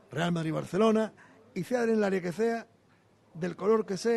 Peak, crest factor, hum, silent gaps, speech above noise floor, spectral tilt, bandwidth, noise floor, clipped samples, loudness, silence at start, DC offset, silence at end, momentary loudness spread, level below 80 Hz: -14 dBFS; 16 dB; none; none; 35 dB; -6.5 dB/octave; 12.5 kHz; -64 dBFS; under 0.1%; -29 LUFS; 0.1 s; under 0.1%; 0 s; 11 LU; -70 dBFS